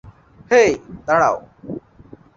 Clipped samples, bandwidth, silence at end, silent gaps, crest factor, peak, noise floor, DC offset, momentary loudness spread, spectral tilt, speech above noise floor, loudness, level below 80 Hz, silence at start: under 0.1%; 7.6 kHz; 0.6 s; none; 18 dB; -2 dBFS; -45 dBFS; under 0.1%; 19 LU; -4.5 dB/octave; 28 dB; -17 LUFS; -52 dBFS; 0.05 s